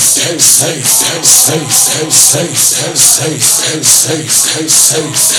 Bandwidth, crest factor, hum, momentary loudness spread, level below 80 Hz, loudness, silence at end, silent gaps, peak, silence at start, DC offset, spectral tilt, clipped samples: over 20 kHz; 10 dB; none; 3 LU; -54 dBFS; -6 LUFS; 0 s; none; 0 dBFS; 0 s; under 0.1%; -1 dB/octave; 2%